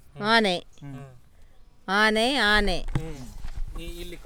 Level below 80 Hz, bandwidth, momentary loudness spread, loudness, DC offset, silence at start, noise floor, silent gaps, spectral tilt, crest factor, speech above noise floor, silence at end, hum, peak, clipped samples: -36 dBFS; 17 kHz; 21 LU; -23 LUFS; under 0.1%; 0.05 s; -49 dBFS; none; -4 dB/octave; 20 dB; 24 dB; 0 s; none; -6 dBFS; under 0.1%